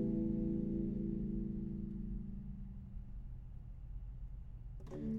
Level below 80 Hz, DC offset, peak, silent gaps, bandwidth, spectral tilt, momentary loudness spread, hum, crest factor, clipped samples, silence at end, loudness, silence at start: -48 dBFS; under 0.1%; -26 dBFS; none; 3.7 kHz; -11.5 dB/octave; 15 LU; none; 14 dB; under 0.1%; 0 s; -43 LUFS; 0 s